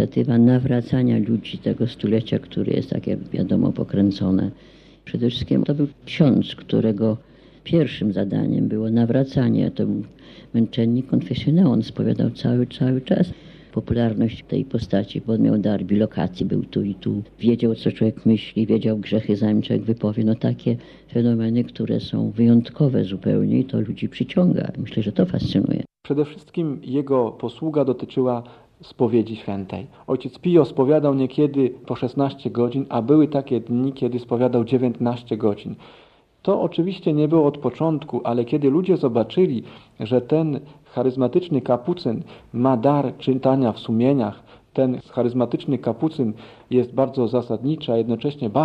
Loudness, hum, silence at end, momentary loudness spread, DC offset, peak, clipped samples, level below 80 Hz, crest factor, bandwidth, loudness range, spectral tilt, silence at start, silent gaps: -21 LUFS; none; 0 s; 8 LU; under 0.1%; -2 dBFS; under 0.1%; -52 dBFS; 18 dB; 6.2 kHz; 2 LU; -9.5 dB/octave; 0 s; none